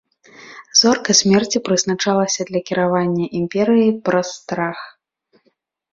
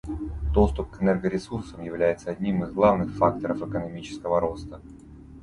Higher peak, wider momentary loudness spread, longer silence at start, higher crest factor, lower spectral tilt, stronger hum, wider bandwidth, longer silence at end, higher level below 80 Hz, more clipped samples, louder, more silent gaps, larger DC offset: first, 0 dBFS vs -6 dBFS; second, 10 LU vs 14 LU; first, 0.4 s vs 0.05 s; about the same, 18 dB vs 20 dB; second, -3.5 dB/octave vs -8 dB/octave; neither; second, 7.8 kHz vs 11 kHz; first, 1.05 s vs 0 s; second, -58 dBFS vs -36 dBFS; neither; first, -17 LUFS vs -26 LUFS; neither; neither